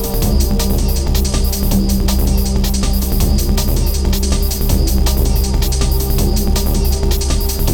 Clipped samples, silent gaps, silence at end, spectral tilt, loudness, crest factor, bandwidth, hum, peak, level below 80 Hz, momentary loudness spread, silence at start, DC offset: under 0.1%; none; 0 s; -5 dB/octave; -16 LUFS; 12 dB; 19.5 kHz; none; -2 dBFS; -14 dBFS; 1 LU; 0 s; under 0.1%